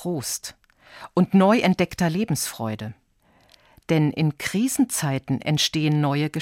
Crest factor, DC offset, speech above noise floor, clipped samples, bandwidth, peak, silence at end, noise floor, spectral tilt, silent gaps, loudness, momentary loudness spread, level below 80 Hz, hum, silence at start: 16 dB; under 0.1%; 38 dB; under 0.1%; 17 kHz; -6 dBFS; 0 s; -60 dBFS; -5 dB/octave; none; -22 LUFS; 12 LU; -58 dBFS; none; 0 s